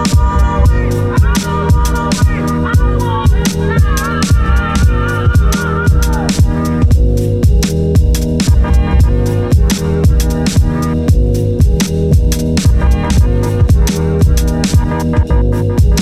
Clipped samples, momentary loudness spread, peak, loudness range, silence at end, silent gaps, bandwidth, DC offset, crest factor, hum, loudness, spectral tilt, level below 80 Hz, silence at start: under 0.1%; 2 LU; 0 dBFS; 1 LU; 0 s; none; 15 kHz; under 0.1%; 10 dB; none; -12 LUFS; -6 dB/octave; -14 dBFS; 0 s